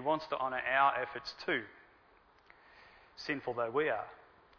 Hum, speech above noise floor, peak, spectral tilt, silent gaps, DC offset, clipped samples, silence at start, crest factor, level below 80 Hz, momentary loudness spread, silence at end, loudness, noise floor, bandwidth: none; 31 dB; -16 dBFS; -5 dB/octave; none; under 0.1%; under 0.1%; 0 s; 20 dB; -72 dBFS; 16 LU; 0.45 s; -34 LUFS; -65 dBFS; 5.4 kHz